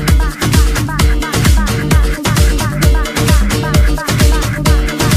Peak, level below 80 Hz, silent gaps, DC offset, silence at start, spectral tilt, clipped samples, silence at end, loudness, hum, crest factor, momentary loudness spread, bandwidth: 0 dBFS; -14 dBFS; none; under 0.1%; 0 s; -5 dB/octave; under 0.1%; 0 s; -13 LUFS; none; 10 dB; 2 LU; 15.5 kHz